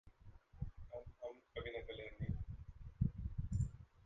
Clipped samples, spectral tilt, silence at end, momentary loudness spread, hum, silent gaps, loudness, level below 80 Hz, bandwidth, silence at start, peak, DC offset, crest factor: under 0.1%; -7.5 dB/octave; 0.05 s; 14 LU; none; none; -47 LUFS; -52 dBFS; 8.8 kHz; 0.05 s; -24 dBFS; under 0.1%; 22 dB